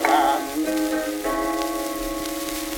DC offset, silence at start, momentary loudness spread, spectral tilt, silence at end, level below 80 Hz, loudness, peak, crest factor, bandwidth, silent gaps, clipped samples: under 0.1%; 0 s; 7 LU; -2.5 dB/octave; 0 s; -44 dBFS; -24 LUFS; -4 dBFS; 20 dB; 17.5 kHz; none; under 0.1%